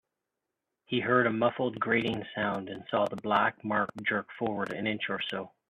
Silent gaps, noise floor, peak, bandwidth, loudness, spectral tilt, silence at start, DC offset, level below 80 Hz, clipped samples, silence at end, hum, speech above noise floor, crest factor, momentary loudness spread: none; -86 dBFS; -10 dBFS; 11 kHz; -30 LUFS; -7 dB/octave; 0.9 s; under 0.1%; -70 dBFS; under 0.1%; 0.25 s; none; 56 dB; 20 dB; 7 LU